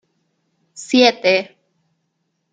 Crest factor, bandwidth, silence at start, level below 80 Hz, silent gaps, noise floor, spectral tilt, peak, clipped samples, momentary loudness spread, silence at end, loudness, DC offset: 18 dB; 9.4 kHz; 0.8 s; -72 dBFS; none; -71 dBFS; -3 dB/octave; -2 dBFS; under 0.1%; 23 LU; 1.1 s; -15 LUFS; under 0.1%